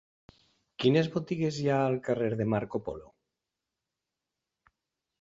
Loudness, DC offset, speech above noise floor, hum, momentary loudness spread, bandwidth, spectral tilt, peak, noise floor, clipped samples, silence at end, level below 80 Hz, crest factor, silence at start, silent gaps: -29 LUFS; under 0.1%; 59 dB; none; 13 LU; 7.8 kHz; -7 dB/octave; -10 dBFS; -88 dBFS; under 0.1%; 2.15 s; -64 dBFS; 22 dB; 0.8 s; none